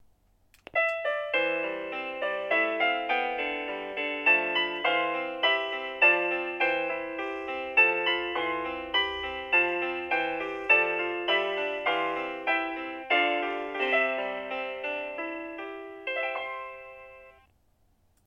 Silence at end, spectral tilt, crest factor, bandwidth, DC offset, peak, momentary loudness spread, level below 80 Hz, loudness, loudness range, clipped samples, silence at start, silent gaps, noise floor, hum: 0.95 s; -4 dB/octave; 20 dB; 9.6 kHz; under 0.1%; -10 dBFS; 12 LU; -64 dBFS; -27 LUFS; 6 LU; under 0.1%; 0.75 s; none; -67 dBFS; none